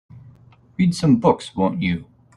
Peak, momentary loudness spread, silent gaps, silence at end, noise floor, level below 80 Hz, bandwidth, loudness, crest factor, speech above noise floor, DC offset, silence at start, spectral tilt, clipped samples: -2 dBFS; 10 LU; none; 0.35 s; -49 dBFS; -52 dBFS; 11.5 kHz; -20 LUFS; 20 dB; 31 dB; under 0.1%; 0.15 s; -7 dB/octave; under 0.1%